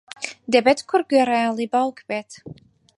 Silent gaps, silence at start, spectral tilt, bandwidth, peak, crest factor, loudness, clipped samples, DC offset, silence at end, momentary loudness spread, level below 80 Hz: none; 0.2 s; -4 dB/octave; 11.5 kHz; -2 dBFS; 20 dB; -20 LUFS; under 0.1%; under 0.1%; 0.45 s; 15 LU; -66 dBFS